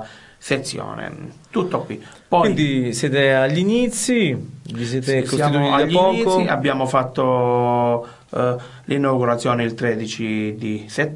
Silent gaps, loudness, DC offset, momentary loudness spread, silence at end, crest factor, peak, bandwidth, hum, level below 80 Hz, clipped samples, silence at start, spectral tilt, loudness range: none; -19 LUFS; under 0.1%; 13 LU; 0 s; 16 dB; -2 dBFS; 11.5 kHz; none; -54 dBFS; under 0.1%; 0 s; -5.5 dB/octave; 3 LU